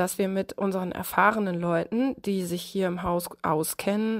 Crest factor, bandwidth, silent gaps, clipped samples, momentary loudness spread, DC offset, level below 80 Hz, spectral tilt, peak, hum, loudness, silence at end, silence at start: 20 dB; 16 kHz; none; under 0.1%; 7 LU; under 0.1%; -56 dBFS; -5.5 dB/octave; -6 dBFS; none; -27 LUFS; 0 s; 0 s